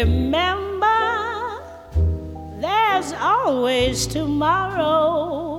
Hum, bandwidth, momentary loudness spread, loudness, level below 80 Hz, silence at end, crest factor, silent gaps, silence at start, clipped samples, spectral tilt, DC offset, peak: none; 15.5 kHz; 10 LU; -20 LUFS; -32 dBFS; 0 s; 14 dB; none; 0 s; under 0.1%; -5 dB/octave; under 0.1%; -6 dBFS